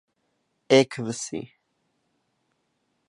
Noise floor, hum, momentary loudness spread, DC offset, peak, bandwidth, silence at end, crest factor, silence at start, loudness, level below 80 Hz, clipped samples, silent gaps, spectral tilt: -74 dBFS; none; 14 LU; under 0.1%; -6 dBFS; 11.5 kHz; 1.6 s; 24 dB; 0.7 s; -23 LUFS; -72 dBFS; under 0.1%; none; -4.5 dB/octave